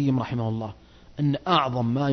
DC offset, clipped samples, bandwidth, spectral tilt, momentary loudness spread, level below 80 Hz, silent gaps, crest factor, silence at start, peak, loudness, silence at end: under 0.1%; under 0.1%; 6.4 kHz; -8 dB/octave; 13 LU; -54 dBFS; none; 18 dB; 0 s; -6 dBFS; -25 LUFS; 0 s